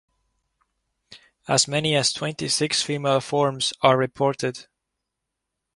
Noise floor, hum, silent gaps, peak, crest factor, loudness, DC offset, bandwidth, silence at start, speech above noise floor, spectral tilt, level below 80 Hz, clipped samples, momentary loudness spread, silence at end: -82 dBFS; none; none; -2 dBFS; 22 dB; -22 LUFS; under 0.1%; 11.5 kHz; 1.1 s; 60 dB; -3.5 dB/octave; -62 dBFS; under 0.1%; 9 LU; 1.15 s